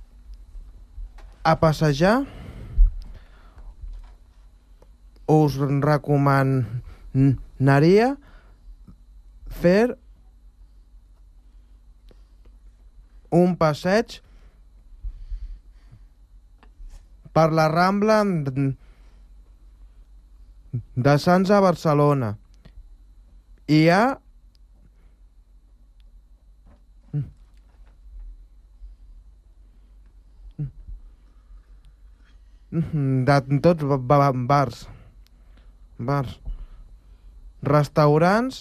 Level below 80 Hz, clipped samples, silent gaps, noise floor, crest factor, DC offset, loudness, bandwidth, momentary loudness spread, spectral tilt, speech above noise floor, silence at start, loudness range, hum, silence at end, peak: -36 dBFS; under 0.1%; none; -52 dBFS; 18 dB; under 0.1%; -21 LUFS; 13.5 kHz; 23 LU; -7.5 dB/octave; 33 dB; 0 s; 19 LU; none; 0 s; -6 dBFS